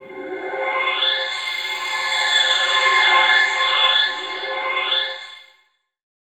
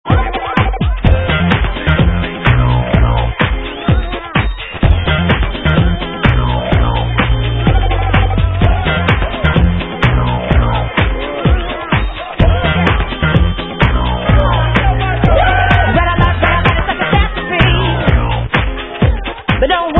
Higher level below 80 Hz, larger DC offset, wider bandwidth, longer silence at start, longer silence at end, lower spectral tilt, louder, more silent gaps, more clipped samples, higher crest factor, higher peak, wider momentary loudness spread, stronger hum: second, -76 dBFS vs -16 dBFS; neither; first, 17.5 kHz vs 4.1 kHz; about the same, 0 s vs 0.05 s; first, 0.8 s vs 0 s; second, 1.5 dB/octave vs -8.5 dB/octave; second, -17 LUFS vs -13 LUFS; neither; second, under 0.1% vs 0.1%; first, 18 dB vs 12 dB; about the same, -2 dBFS vs 0 dBFS; first, 13 LU vs 5 LU; neither